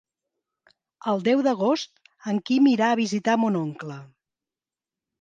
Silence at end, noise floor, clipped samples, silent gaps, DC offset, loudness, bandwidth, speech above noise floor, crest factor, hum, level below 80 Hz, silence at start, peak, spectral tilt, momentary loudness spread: 1.15 s; under -90 dBFS; under 0.1%; none; under 0.1%; -23 LUFS; 9 kHz; over 68 dB; 18 dB; none; -76 dBFS; 1.05 s; -8 dBFS; -5.5 dB/octave; 18 LU